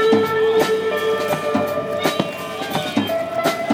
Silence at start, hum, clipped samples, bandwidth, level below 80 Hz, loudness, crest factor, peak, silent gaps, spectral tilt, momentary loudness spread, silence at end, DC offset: 0 s; none; under 0.1%; 16.5 kHz; -62 dBFS; -20 LUFS; 16 dB; -4 dBFS; none; -4.5 dB/octave; 7 LU; 0 s; under 0.1%